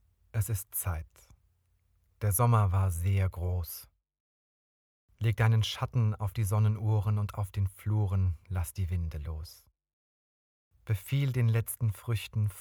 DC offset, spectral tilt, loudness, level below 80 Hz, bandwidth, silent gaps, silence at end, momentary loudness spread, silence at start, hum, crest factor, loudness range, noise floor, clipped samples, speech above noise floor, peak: under 0.1%; -6 dB/octave; -31 LUFS; -48 dBFS; 18 kHz; 4.20-5.08 s, 9.93-10.71 s; 0 s; 11 LU; 0.35 s; none; 16 dB; 5 LU; -71 dBFS; under 0.1%; 42 dB; -14 dBFS